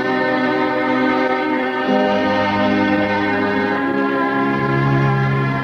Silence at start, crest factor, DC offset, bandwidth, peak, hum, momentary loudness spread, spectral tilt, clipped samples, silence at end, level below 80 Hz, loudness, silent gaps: 0 s; 14 dB; under 0.1%; 6.8 kHz; -4 dBFS; none; 2 LU; -7.5 dB/octave; under 0.1%; 0 s; -48 dBFS; -17 LUFS; none